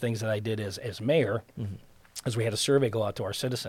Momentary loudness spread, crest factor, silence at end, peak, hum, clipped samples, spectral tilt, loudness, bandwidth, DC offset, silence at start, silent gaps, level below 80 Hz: 14 LU; 16 dB; 0 s; -12 dBFS; none; under 0.1%; -5 dB/octave; -29 LUFS; 16.5 kHz; under 0.1%; 0 s; none; -62 dBFS